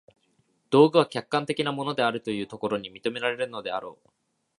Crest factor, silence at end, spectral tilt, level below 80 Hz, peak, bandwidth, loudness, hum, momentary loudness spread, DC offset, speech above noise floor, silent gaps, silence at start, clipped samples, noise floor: 24 dB; 0.65 s; -6 dB/octave; -70 dBFS; -4 dBFS; 11.5 kHz; -26 LUFS; none; 13 LU; under 0.1%; 44 dB; none; 0.7 s; under 0.1%; -69 dBFS